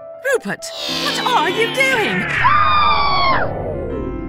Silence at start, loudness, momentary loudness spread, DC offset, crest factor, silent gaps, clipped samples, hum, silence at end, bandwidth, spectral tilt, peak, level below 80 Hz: 0 s; -16 LUFS; 11 LU; under 0.1%; 16 dB; none; under 0.1%; none; 0 s; 16 kHz; -3.5 dB/octave; -2 dBFS; -36 dBFS